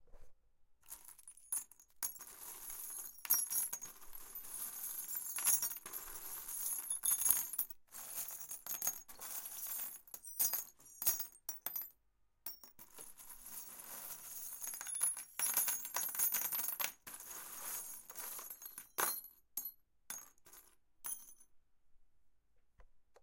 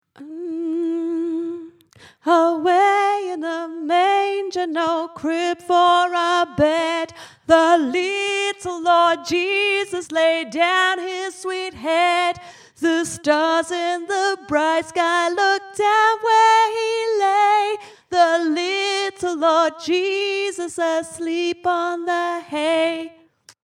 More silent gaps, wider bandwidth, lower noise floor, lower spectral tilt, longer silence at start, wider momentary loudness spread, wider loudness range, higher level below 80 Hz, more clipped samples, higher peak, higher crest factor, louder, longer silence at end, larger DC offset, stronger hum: neither; first, 17 kHz vs 13 kHz; first, -75 dBFS vs -42 dBFS; second, 1.5 dB/octave vs -3 dB/octave; second, 0 s vs 0.2 s; first, 17 LU vs 10 LU; first, 10 LU vs 4 LU; second, -74 dBFS vs -60 dBFS; neither; second, -8 dBFS vs -2 dBFS; first, 34 dB vs 18 dB; second, -39 LUFS vs -19 LUFS; second, 0.1 s vs 0.55 s; neither; neither